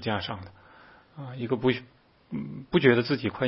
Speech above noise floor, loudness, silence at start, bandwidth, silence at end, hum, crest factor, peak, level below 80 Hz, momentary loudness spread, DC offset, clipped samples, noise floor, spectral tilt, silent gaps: 27 dB; -27 LUFS; 0 s; 5.8 kHz; 0 s; none; 22 dB; -6 dBFS; -58 dBFS; 19 LU; under 0.1%; under 0.1%; -54 dBFS; -10.5 dB/octave; none